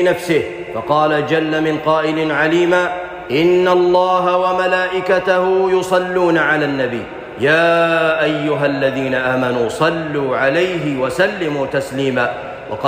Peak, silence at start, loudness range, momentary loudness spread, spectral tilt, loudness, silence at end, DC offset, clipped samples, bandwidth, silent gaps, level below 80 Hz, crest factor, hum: -4 dBFS; 0 s; 3 LU; 7 LU; -5.5 dB/octave; -16 LUFS; 0 s; under 0.1%; under 0.1%; 15.5 kHz; none; -50 dBFS; 12 dB; none